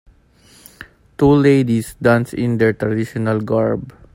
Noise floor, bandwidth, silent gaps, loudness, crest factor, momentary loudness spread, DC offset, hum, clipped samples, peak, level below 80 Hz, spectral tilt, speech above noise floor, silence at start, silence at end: -50 dBFS; 16.5 kHz; none; -17 LUFS; 16 dB; 8 LU; under 0.1%; none; under 0.1%; 0 dBFS; -44 dBFS; -7.5 dB/octave; 34 dB; 0.8 s; 0.25 s